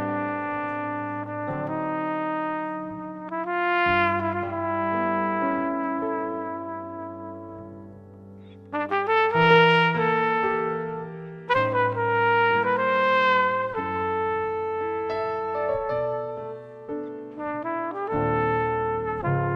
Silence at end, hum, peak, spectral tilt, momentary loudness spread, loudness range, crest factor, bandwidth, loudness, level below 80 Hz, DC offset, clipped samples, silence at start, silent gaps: 0 s; none; -4 dBFS; -7.5 dB/octave; 15 LU; 8 LU; 22 dB; 6.8 kHz; -24 LUFS; -56 dBFS; under 0.1%; under 0.1%; 0 s; none